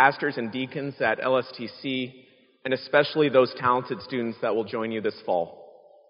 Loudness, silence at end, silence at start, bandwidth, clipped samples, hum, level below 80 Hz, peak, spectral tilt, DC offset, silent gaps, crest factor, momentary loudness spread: -26 LUFS; 0.4 s; 0 s; 5.4 kHz; under 0.1%; none; -72 dBFS; -4 dBFS; -3 dB/octave; under 0.1%; none; 22 dB; 11 LU